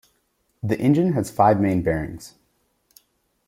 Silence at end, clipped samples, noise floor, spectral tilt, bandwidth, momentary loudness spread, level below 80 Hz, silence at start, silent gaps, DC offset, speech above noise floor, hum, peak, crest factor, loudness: 1.2 s; under 0.1%; -69 dBFS; -8 dB/octave; 16 kHz; 15 LU; -50 dBFS; 0.65 s; none; under 0.1%; 49 dB; none; -4 dBFS; 20 dB; -21 LUFS